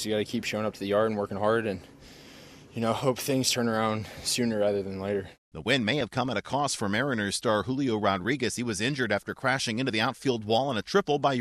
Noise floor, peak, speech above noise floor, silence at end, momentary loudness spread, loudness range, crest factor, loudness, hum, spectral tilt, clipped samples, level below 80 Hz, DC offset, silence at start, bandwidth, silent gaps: -49 dBFS; -10 dBFS; 22 dB; 0 s; 6 LU; 2 LU; 18 dB; -28 LUFS; none; -4 dB/octave; under 0.1%; -60 dBFS; under 0.1%; 0 s; 13.5 kHz; 5.38-5.52 s